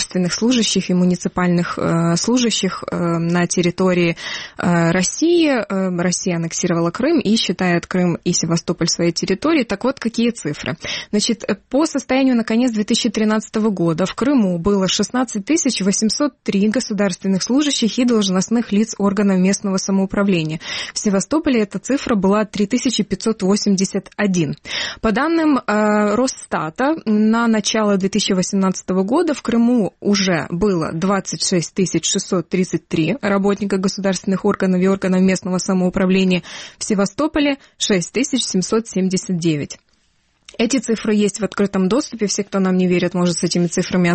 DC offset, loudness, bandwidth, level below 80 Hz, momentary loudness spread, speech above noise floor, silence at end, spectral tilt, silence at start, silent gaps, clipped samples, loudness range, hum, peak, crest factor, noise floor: under 0.1%; -18 LUFS; 8.8 kHz; -48 dBFS; 5 LU; 44 dB; 0 s; -4.5 dB/octave; 0 s; none; under 0.1%; 2 LU; none; -6 dBFS; 12 dB; -61 dBFS